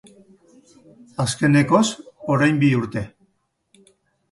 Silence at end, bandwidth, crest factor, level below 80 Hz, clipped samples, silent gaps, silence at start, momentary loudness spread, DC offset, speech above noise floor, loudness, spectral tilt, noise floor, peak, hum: 1.25 s; 11.5 kHz; 18 dB; -54 dBFS; under 0.1%; none; 1.2 s; 16 LU; under 0.1%; 50 dB; -19 LUFS; -5.5 dB/octave; -68 dBFS; -4 dBFS; none